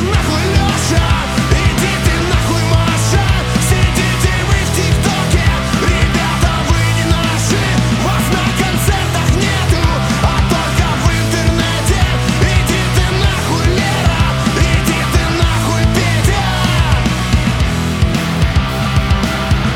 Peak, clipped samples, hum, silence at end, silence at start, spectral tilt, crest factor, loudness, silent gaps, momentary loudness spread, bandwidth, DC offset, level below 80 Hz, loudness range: 0 dBFS; under 0.1%; none; 0 s; 0 s; -5 dB/octave; 12 dB; -13 LUFS; none; 2 LU; 17 kHz; under 0.1%; -20 dBFS; 1 LU